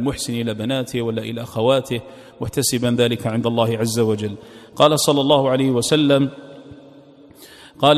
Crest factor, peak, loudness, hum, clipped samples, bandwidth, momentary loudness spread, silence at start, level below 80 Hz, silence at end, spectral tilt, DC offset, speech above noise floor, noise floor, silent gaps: 20 dB; 0 dBFS; -19 LUFS; none; under 0.1%; 15 kHz; 12 LU; 0 s; -52 dBFS; 0 s; -5 dB/octave; under 0.1%; 26 dB; -45 dBFS; none